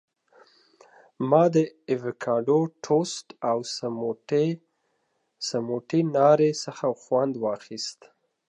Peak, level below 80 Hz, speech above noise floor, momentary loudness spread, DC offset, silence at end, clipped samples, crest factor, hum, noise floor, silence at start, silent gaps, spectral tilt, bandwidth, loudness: -6 dBFS; -80 dBFS; 49 dB; 12 LU; under 0.1%; 0.55 s; under 0.1%; 20 dB; none; -74 dBFS; 1.2 s; none; -6 dB/octave; 10.5 kHz; -25 LUFS